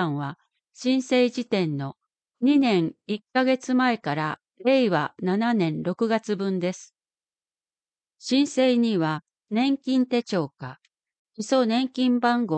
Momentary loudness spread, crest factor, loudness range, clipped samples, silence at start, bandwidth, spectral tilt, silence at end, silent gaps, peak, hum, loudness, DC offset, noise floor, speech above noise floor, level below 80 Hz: 12 LU; 16 dB; 3 LU; under 0.1%; 0 s; 8.8 kHz; -6 dB/octave; 0 s; 11.18-11.25 s; -8 dBFS; none; -24 LUFS; under 0.1%; under -90 dBFS; over 67 dB; -76 dBFS